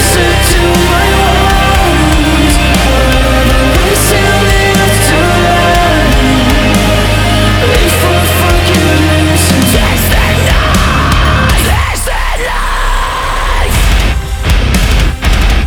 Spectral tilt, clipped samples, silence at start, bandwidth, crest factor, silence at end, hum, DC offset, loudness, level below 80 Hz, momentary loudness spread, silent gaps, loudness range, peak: -4.5 dB/octave; under 0.1%; 0 s; over 20 kHz; 8 dB; 0 s; none; under 0.1%; -9 LUFS; -12 dBFS; 5 LU; none; 4 LU; 0 dBFS